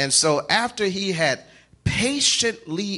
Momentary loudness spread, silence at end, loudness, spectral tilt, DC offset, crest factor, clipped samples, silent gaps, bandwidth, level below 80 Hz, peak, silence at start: 10 LU; 0 s; -21 LUFS; -2.5 dB/octave; under 0.1%; 18 dB; under 0.1%; none; 11.5 kHz; -48 dBFS; -4 dBFS; 0 s